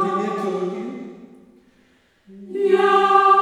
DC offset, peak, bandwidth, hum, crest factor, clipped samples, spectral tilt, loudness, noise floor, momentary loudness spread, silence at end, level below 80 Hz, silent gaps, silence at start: under 0.1%; -2 dBFS; 10.5 kHz; none; 18 dB; under 0.1%; -5.5 dB/octave; -18 LUFS; -58 dBFS; 19 LU; 0 s; -72 dBFS; none; 0 s